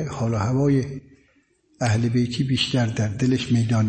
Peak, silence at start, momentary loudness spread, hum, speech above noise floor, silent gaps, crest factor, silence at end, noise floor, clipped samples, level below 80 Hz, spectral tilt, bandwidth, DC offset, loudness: -8 dBFS; 0 s; 5 LU; none; 41 dB; none; 14 dB; 0 s; -62 dBFS; under 0.1%; -50 dBFS; -6 dB/octave; 8.8 kHz; under 0.1%; -22 LUFS